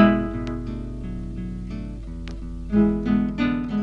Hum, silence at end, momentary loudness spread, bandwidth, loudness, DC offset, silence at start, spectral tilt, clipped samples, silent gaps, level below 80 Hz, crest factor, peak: 50 Hz at -35 dBFS; 0 s; 15 LU; 6.6 kHz; -26 LUFS; under 0.1%; 0 s; -8.5 dB/octave; under 0.1%; none; -34 dBFS; 22 dB; 0 dBFS